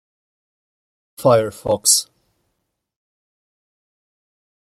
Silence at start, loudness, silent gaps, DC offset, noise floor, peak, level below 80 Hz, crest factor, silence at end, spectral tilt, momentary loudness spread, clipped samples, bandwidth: 1.2 s; -16 LUFS; none; under 0.1%; -75 dBFS; 0 dBFS; -60 dBFS; 24 dB; 2.75 s; -3 dB/octave; 6 LU; under 0.1%; 16 kHz